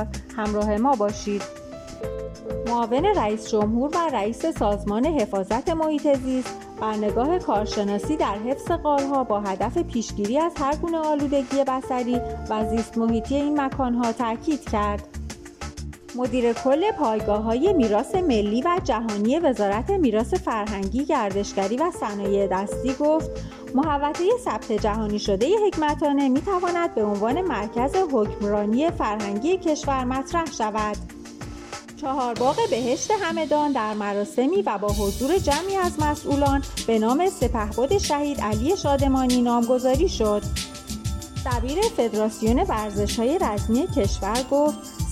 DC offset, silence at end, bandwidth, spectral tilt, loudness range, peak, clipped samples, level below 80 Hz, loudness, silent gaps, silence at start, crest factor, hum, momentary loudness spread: under 0.1%; 0 s; 16 kHz; -5.5 dB/octave; 3 LU; -8 dBFS; under 0.1%; -38 dBFS; -23 LUFS; none; 0 s; 14 dB; none; 8 LU